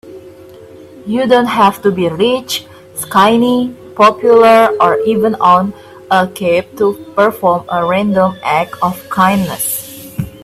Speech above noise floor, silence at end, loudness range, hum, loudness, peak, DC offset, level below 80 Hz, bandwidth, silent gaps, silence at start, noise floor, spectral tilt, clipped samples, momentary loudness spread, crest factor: 24 dB; 0 s; 4 LU; none; -12 LUFS; 0 dBFS; under 0.1%; -50 dBFS; 16 kHz; none; 0.05 s; -35 dBFS; -5 dB/octave; under 0.1%; 12 LU; 12 dB